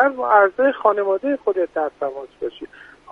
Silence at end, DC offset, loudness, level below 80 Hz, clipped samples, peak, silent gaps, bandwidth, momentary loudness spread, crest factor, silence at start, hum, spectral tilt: 0.3 s; under 0.1%; -19 LUFS; -62 dBFS; under 0.1%; -2 dBFS; none; 4.9 kHz; 15 LU; 18 dB; 0 s; none; -6 dB/octave